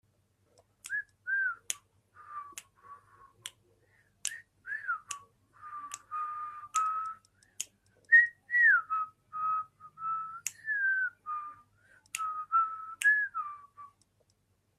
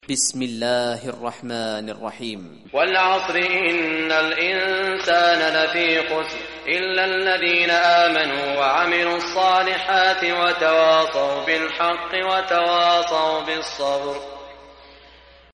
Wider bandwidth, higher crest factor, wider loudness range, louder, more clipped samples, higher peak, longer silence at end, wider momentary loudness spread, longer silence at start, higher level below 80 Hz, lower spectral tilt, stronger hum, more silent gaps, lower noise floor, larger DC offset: first, 15 kHz vs 11.5 kHz; first, 24 dB vs 14 dB; first, 14 LU vs 4 LU; second, -31 LUFS vs -19 LUFS; neither; second, -12 dBFS vs -6 dBFS; about the same, 0.9 s vs 0.8 s; first, 24 LU vs 12 LU; first, 0.85 s vs 0.1 s; second, -82 dBFS vs -56 dBFS; second, 2 dB/octave vs -2 dB/octave; neither; neither; first, -73 dBFS vs -48 dBFS; neither